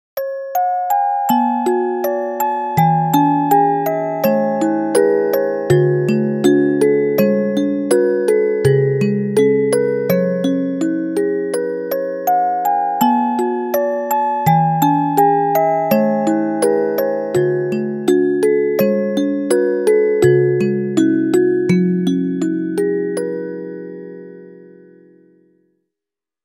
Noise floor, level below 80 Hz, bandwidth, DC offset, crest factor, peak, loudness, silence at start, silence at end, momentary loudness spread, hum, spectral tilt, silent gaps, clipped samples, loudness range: -87 dBFS; -60 dBFS; 18.5 kHz; under 0.1%; 16 dB; 0 dBFS; -16 LUFS; 0.15 s; 1.8 s; 6 LU; none; -7 dB/octave; none; under 0.1%; 3 LU